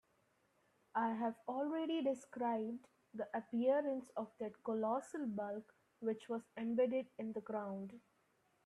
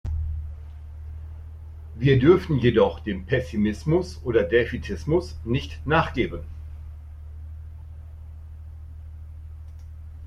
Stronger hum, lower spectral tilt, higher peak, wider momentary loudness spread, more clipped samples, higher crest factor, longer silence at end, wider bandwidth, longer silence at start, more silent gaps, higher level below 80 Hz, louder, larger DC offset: neither; second, -6.5 dB/octave vs -8 dB/octave; second, -24 dBFS vs -4 dBFS; second, 10 LU vs 22 LU; neither; about the same, 18 dB vs 20 dB; first, 0.65 s vs 0 s; about the same, 11.5 kHz vs 11 kHz; first, 0.95 s vs 0.05 s; neither; second, -88 dBFS vs -38 dBFS; second, -41 LUFS vs -23 LUFS; neither